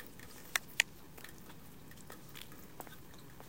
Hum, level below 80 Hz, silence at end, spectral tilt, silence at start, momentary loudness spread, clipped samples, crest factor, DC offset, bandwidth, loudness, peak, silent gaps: none; -66 dBFS; 0 s; -1 dB/octave; 0 s; 20 LU; under 0.1%; 40 dB; 0.2%; 17 kHz; -39 LUFS; -6 dBFS; none